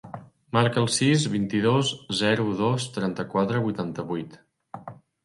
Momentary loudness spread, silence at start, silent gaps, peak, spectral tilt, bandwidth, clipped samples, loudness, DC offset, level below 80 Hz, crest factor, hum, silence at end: 20 LU; 0.05 s; none; -4 dBFS; -5 dB/octave; 11.5 kHz; under 0.1%; -25 LUFS; under 0.1%; -62 dBFS; 20 dB; none; 0.3 s